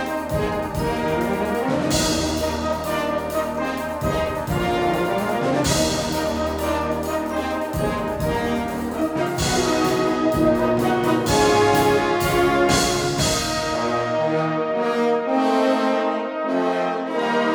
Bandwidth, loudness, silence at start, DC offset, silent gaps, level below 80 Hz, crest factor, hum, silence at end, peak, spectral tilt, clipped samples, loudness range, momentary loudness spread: over 20 kHz; -21 LUFS; 0 s; under 0.1%; none; -38 dBFS; 16 dB; none; 0 s; -6 dBFS; -4.5 dB/octave; under 0.1%; 4 LU; 6 LU